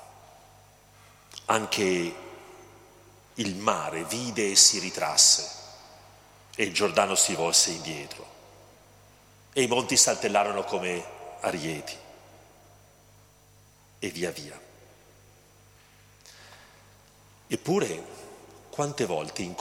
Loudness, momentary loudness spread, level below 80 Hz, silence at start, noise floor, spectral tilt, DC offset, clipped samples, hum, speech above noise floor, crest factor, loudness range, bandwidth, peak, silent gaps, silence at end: -24 LUFS; 24 LU; -64 dBFS; 0 s; -57 dBFS; -1.5 dB/octave; under 0.1%; under 0.1%; 50 Hz at -60 dBFS; 31 dB; 26 dB; 18 LU; 17 kHz; -4 dBFS; none; 0 s